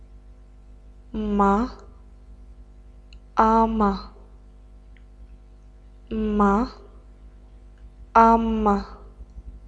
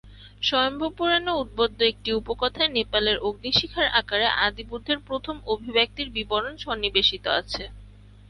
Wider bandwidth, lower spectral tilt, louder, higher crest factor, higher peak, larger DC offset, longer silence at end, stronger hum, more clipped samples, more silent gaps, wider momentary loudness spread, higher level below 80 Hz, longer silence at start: second, 7.8 kHz vs 11 kHz; first, -8 dB/octave vs -4 dB/octave; first, -21 LUFS vs -24 LUFS; about the same, 22 dB vs 20 dB; about the same, -4 dBFS vs -6 dBFS; neither; second, 0 s vs 0.4 s; first, 50 Hz at -40 dBFS vs none; neither; neither; first, 18 LU vs 9 LU; first, -40 dBFS vs -46 dBFS; about the same, 0.15 s vs 0.05 s